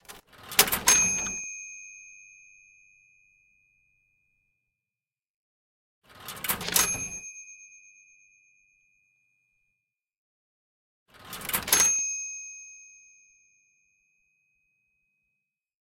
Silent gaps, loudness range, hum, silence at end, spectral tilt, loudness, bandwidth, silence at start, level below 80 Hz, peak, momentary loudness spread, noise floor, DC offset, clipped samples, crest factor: 5.30-6.02 s, 10.18-11.06 s; 20 LU; none; 3.1 s; 0.5 dB/octave; -24 LUFS; 16.5 kHz; 0.1 s; -60 dBFS; -2 dBFS; 26 LU; under -90 dBFS; under 0.1%; under 0.1%; 32 dB